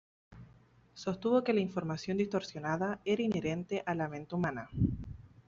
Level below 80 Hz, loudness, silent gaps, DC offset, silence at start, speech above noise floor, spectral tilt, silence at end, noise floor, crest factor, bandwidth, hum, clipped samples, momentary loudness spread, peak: -54 dBFS; -34 LUFS; none; under 0.1%; 0.3 s; 29 dB; -6 dB/octave; 0.2 s; -62 dBFS; 18 dB; 7.6 kHz; none; under 0.1%; 7 LU; -18 dBFS